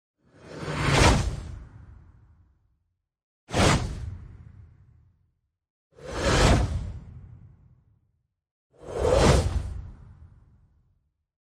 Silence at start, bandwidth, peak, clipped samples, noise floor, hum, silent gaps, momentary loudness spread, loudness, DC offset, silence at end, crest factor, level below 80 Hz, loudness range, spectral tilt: 0.45 s; 14.5 kHz; -6 dBFS; under 0.1%; -77 dBFS; none; 3.23-3.47 s, 5.70-5.90 s, 8.51-8.70 s; 25 LU; -24 LUFS; under 0.1%; 1.25 s; 22 dB; -34 dBFS; 4 LU; -5 dB/octave